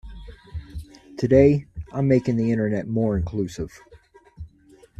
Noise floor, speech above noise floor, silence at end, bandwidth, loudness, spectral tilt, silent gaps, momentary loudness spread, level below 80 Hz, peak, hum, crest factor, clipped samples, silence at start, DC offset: -53 dBFS; 33 dB; 0.55 s; 9.2 kHz; -22 LUFS; -8.5 dB/octave; none; 27 LU; -42 dBFS; -4 dBFS; none; 20 dB; under 0.1%; 0.05 s; under 0.1%